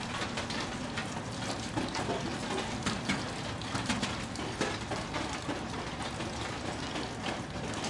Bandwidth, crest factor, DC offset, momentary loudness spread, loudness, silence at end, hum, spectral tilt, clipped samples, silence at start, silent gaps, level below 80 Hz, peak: 11.5 kHz; 18 dB; under 0.1%; 4 LU; -35 LUFS; 0 s; none; -4 dB/octave; under 0.1%; 0 s; none; -52 dBFS; -16 dBFS